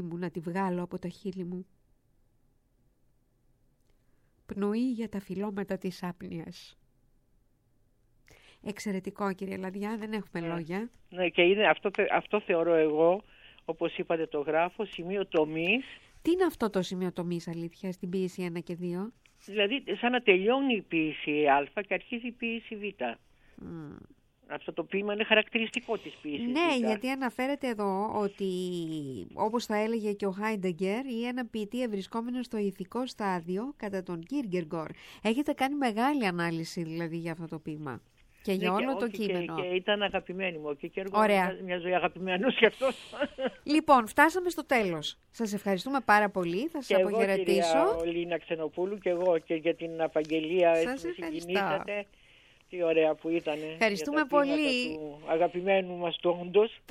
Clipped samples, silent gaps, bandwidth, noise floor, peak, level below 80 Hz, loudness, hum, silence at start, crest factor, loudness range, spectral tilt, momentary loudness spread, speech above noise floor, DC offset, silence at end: under 0.1%; none; 16.5 kHz; -69 dBFS; -8 dBFS; -64 dBFS; -30 LUFS; none; 0 s; 24 dB; 10 LU; -5.5 dB/octave; 13 LU; 39 dB; under 0.1%; 0.15 s